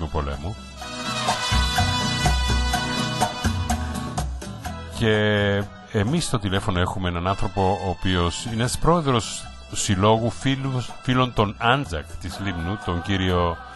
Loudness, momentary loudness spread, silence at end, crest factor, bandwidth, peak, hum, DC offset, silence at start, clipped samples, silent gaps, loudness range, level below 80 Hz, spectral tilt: -23 LUFS; 11 LU; 0 s; 18 dB; 12.5 kHz; -4 dBFS; none; under 0.1%; 0 s; under 0.1%; none; 2 LU; -32 dBFS; -4.5 dB/octave